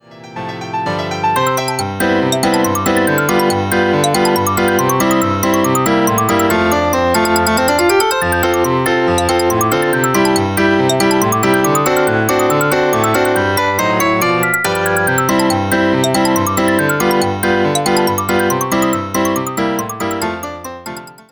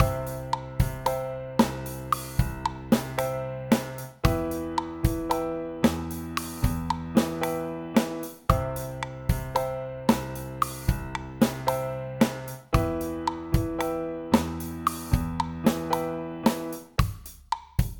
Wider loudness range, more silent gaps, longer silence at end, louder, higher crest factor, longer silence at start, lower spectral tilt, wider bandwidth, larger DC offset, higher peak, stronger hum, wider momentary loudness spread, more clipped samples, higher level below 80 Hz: about the same, 2 LU vs 1 LU; neither; first, 0.2 s vs 0 s; first, -14 LUFS vs -28 LUFS; second, 12 dB vs 22 dB; about the same, 0.1 s vs 0 s; second, -4.5 dB/octave vs -6 dB/octave; about the same, over 20 kHz vs 19 kHz; first, 0.2% vs under 0.1%; first, -2 dBFS vs -6 dBFS; neither; about the same, 6 LU vs 7 LU; neither; second, -42 dBFS vs -36 dBFS